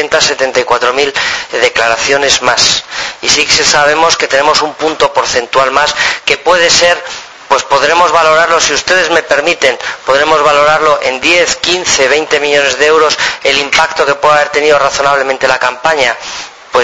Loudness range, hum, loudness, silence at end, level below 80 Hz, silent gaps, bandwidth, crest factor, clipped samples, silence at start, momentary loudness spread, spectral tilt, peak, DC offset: 1 LU; none; -9 LUFS; 0 s; -42 dBFS; none; 11 kHz; 10 dB; 1%; 0 s; 5 LU; -1 dB/octave; 0 dBFS; under 0.1%